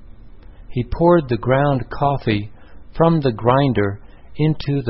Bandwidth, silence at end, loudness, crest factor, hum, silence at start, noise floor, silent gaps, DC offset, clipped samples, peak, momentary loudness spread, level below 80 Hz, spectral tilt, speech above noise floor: 5.8 kHz; 0 s; -18 LUFS; 16 dB; none; 0 s; -39 dBFS; none; 0.6%; under 0.1%; -2 dBFS; 14 LU; -38 dBFS; -12 dB/octave; 22 dB